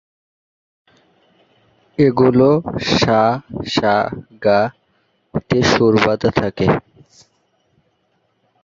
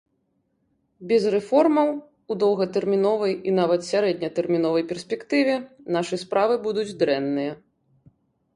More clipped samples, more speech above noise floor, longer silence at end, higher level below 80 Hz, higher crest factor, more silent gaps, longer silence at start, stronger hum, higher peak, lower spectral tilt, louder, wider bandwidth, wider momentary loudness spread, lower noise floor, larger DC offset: neither; about the same, 49 dB vs 49 dB; first, 1.85 s vs 1 s; first, -46 dBFS vs -68 dBFS; about the same, 18 dB vs 16 dB; neither; first, 2 s vs 1 s; neither; first, 0 dBFS vs -6 dBFS; about the same, -6 dB/octave vs -6 dB/octave; first, -16 LUFS vs -23 LUFS; second, 7.6 kHz vs 11.5 kHz; first, 11 LU vs 8 LU; second, -64 dBFS vs -71 dBFS; neither